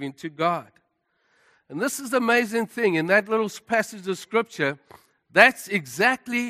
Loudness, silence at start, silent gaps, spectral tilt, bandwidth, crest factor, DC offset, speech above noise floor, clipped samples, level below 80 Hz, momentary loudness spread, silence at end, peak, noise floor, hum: -23 LUFS; 0 s; none; -4 dB/octave; 15 kHz; 24 dB; under 0.1%; 48 dB; under 0.1%; -72 dBFS; 13 LU; 0 s; 0 dBFS; -71 dBFS; none